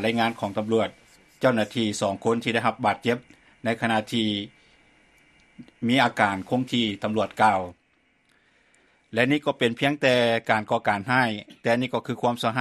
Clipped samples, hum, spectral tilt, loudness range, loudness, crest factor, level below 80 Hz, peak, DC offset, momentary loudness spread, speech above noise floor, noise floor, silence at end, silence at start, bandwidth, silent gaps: under 0.1%; none; -5 dB/octave; 3 LU; -24 LUFS; 22 dB; -64 dBFS; -4 dBFS; under 0.1%; 8 LU; 42 dB; -66 dBFS; 0 s; 0 s; 13.5 kHz; none